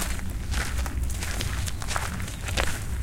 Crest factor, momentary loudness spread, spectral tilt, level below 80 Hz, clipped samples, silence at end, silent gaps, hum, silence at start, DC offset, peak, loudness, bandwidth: 22 dB; 4 LU; -3.5 dB/octave; -32 dBFS; under 0.1%; 0 s; none; none; 0 s; under 0.1%; -4 dBFS; -30 LUFS; 17 kHz